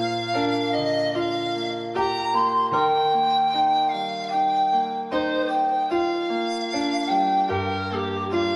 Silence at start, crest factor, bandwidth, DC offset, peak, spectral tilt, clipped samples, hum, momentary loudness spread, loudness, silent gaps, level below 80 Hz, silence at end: 0 s; 14 dB; 11.5 kHz; under 0.1%; -10 dBFS; -5 dB/octave; under 0.1%; none; 6 LU; -23 LUFS; none; -60 dBFS; 0 s